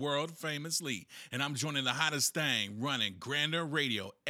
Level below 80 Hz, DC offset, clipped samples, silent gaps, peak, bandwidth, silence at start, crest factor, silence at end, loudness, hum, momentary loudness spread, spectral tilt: -88 dBFS; under 0.1%; under 0.1%; none; -14 dBFS; 18.5 kHz; 0 s; 22 dB; 0 s; -33 LUFS; none; 8 LU; -2.5 dB/octave